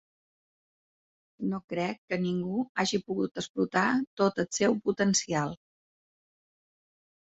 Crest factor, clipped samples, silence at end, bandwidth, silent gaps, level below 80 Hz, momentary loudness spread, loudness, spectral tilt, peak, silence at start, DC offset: 20 dB; under 0.1%; 1.8 s; 8.2 kHz; 1.64-1.68 s, 1.98-2.08 s, 2.69-2.75 s, 3.49-3.54 s, 4.07-4.17 s; -68 dBFS; 8 LU; -29 LUFS; -4.5 dB/octave; -10 dBFS; 1.4 s; under 0.1%